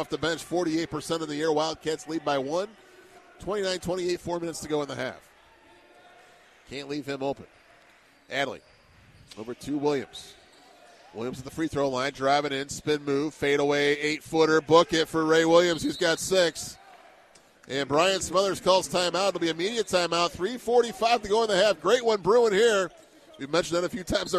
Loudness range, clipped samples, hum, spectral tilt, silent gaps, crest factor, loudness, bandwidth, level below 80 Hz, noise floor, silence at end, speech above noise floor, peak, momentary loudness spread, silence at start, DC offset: 12 LU; under 0.1%; none; -3.5 dB/octave; none; 20 dB; -26 LUFS; 14 kHz; -56 dBFS; -58 dBFS; 0 s; 32 dB; -6 dBFS; 14 LU; 0 s; under 0.1%